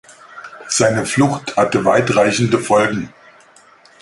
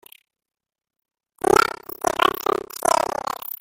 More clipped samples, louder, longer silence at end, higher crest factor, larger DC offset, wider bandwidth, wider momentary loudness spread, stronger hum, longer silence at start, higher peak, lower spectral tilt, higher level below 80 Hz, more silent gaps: neither; first, -15 LUFS vs -21 LUFS; first, 0.95 s vs 0.1 s; about the same, 18 dB vs 22 dB; neither; second, 11.5 kHz vs 17 kHz; first, 19 LU vs 9 LU; neither; second, 0.35 s vs 1.45 s; about the same, 0 dBFS vs -2 dBFS; first, -4.5 dB/octave vs -2.5 dB/octave; about the same, -52 dBFS vs -54 dBFS; neither